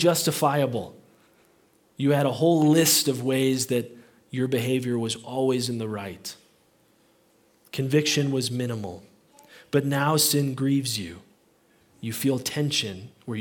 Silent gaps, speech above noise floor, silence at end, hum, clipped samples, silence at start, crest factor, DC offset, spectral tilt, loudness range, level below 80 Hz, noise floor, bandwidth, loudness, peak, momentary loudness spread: none; 38 dB; 0 s; none; under 0.1%; 0 s; 18 dB; under 0.1%; -4.5 dB/octave; 6 LU; -70 dBFS; -62 dBFS; 18 kHz; -24 LUFS; -8 dBFS; 16 LU